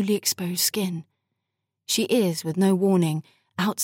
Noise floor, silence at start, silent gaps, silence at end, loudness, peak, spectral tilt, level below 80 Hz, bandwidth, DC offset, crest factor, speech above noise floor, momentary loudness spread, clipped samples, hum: -82 dBFS; 0 s; none; 0 s; -23 LUFS; -8 dBFS; -4.5 dB/octave; -78 dBFS; 17 kHz; under 0.1%; 16 dB; 59 dB; 12 LU; under 0.1%; none